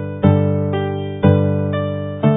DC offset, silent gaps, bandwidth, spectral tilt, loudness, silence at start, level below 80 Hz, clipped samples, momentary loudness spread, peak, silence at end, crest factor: under 0.1%; none; 3.8 kHz; -12 dB/octave; -17 LUFS; 0 s; -32 dBFS; under 0.1%; 7 LU; 0 dBFS; 0 s; 16 dB